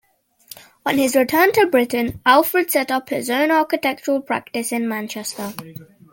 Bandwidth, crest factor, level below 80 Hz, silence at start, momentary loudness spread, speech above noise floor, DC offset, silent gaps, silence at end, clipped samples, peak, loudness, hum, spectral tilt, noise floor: 17 kHz; 18 dB; -56 dBFS; 0.85 s; 13 LU; 27 dB; under 0.1%; none; 0.3 s; under 0.1%; -2 dBFS; -18 LUFS; none; -3.5 dB/octave; -46 dBFS